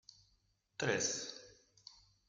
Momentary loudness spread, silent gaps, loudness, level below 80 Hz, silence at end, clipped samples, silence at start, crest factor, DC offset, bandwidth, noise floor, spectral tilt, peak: 23 LU; none; -38 LUFS; -76 dBFS; 0.35 s; under 0.1%; 0.8 s; 24 dB; under 0.1%; 10.5 kHz; -77 dBFS; -2.5 dB/octave; -20 dBFS